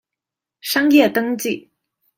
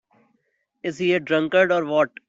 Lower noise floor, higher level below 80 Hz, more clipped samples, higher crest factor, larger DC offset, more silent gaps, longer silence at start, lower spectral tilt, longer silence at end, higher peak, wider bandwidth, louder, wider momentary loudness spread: first, -85 dBFS vs -71 dBFS; about the same, -64 dBFS vs -68 dBFS; neither; about the same, 18 dB vs 18 dB; neither; neither; second, 0.65 s vs 0.85 s; second, -3.5 dB/octave vs -6 dB/octave; first, 0.6 s vs 0.2 s; about the same, -2 dBFS vs -4 dBFS; first, 16.5 kHz vs 7.8 kHz; first, -17 LUFS vs -21 LUFS; first, 15 LU vs 11 LU